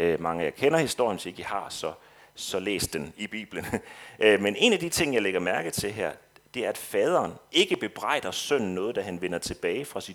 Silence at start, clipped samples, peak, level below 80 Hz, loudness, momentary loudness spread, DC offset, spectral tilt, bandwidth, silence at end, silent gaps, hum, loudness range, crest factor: 0 s; under 0.1%; -4 dBFS; -58 dBFS; -27 LUFS; 12 LU; under 0.1%; -3.5 dB/octave; 19 kHz; 0 s; none; none; 4 LU; 22 dB